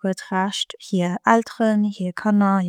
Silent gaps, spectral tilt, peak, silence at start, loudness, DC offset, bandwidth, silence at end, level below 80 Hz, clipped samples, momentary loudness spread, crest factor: none; -5.5 dB/octave; -2 dBFS; 0.05 s; -21 LUFS; under 0.1%; 10.5 kHz; 0 s; -72 dBFS; under 0.1%; 7 LU; 18 dB